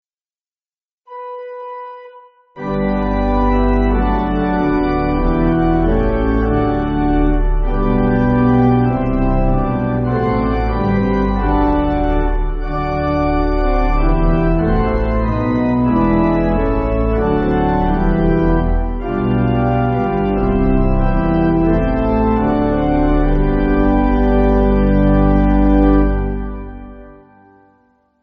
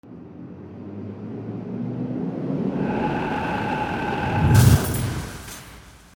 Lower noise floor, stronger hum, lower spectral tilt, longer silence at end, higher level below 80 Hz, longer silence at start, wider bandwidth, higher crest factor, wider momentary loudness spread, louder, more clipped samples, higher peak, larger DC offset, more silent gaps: first, under -90 dBFS vs -45 dBFS; neither; first, -8 dB/octave vs -6 dB/octave; first, 1.1 s vs 0.2 s; first, -20 dBFS vs -38 dBFS; first, 1.1 s vs 0.05 s; second, 5 kHz vs over 20 kHz; second, 14 dB vs 20 dB; second, 7 LU vs 22 LU; first, -16 LUFS vs -23 LUFS; neither; about the same, -2 dBFS vs -2 dBFS; neither; neither